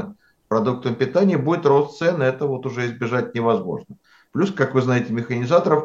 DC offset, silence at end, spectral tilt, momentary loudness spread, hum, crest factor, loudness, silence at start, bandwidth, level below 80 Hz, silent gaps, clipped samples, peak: under 0.1%; 0 s; -7.5 dB/octave; 7 LU; none; 18 dB; -21 LUFS; 0 s; 7.6 kHz; -64 dBFS; none; under 0.1%; -2 dBFS